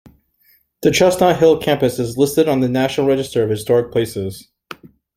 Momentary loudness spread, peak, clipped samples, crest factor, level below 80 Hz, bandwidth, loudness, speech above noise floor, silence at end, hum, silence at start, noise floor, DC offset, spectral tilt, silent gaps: 15 LU; 0 dBFS; under 0.1%; 16 dB; -48 dBFS; 16 kHz; -16 LUFS; 42 dB; 0.75 s; none; 0.8 s; -57 dBFS; under 0.1%; -5.5 dB/octave; none